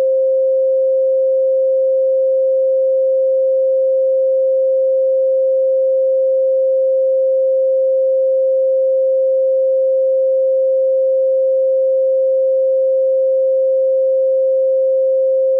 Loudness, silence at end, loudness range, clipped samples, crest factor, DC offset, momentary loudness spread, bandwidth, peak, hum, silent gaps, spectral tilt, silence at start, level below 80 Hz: -14 LUFS; 0 s; 0 LU; under 0.1%; 4 dB; under 0.1%; 0 LU; 0.6 kHz; -10 dBFS; none; none; -8 dB/octave; 0 s; under -90 dBFS